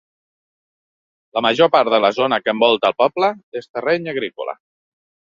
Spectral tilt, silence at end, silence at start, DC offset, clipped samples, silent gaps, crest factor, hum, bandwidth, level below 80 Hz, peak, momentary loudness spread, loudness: -5 dB/octave; 0.7 s; 1.35 s; under 0.1%; under 0.1%; 3.43-3.52 s, 3.69-3.74 s; 18 dB; none; 7.4 kHz; -64 dBFS; 0 dBFS; 15 LU; -17 LUFS